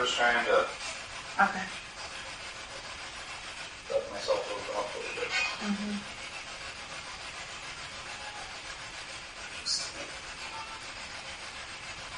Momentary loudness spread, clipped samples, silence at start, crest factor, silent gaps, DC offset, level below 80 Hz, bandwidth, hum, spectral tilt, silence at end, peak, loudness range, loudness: 12 LU; under 0.1%; 0 s; 24 dB; none; under 0.1%; -58 dBFS; 10.5 kHz; none; -2 dB/octave; 0 s; -12 dBFS; 6 LU; -34 LUFS